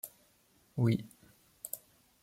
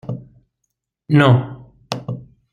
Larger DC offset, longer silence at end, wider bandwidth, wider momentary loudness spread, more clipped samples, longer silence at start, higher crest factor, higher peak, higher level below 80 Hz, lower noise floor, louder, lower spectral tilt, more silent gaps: neither; first, 0.45 s vs 0.3 s; first, 16.5 kHz vs 9.6 kHz; second, 17 LU vs 20 LU; neither; about the same, 0.05 s vs 0.05 s; about the same, 20 dB vs 18 dB; second, -18 dBFS vs -2 dBFS; second, -70 dBFS vs -54 dBFS; second, -69 dBFS vs -76 dBFS; second, -36 LUFS vs -17 LUFS; about the same, -6.5 dB/octave vs -7.5 dB/octave; neither